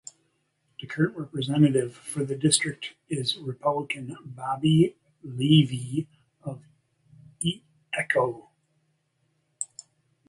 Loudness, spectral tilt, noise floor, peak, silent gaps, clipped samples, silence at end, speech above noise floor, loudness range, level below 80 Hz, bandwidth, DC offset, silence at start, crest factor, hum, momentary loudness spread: -26 LUFS; -5 dB/octave; -72 dBFS; -6 dBFS; none; under 0.1%; 0.65 s; 47 dB; 6 LU; -66 dBFS; 11.5 kHz; under 0.1%; 0.8 s; 22 dB; none; 19 LU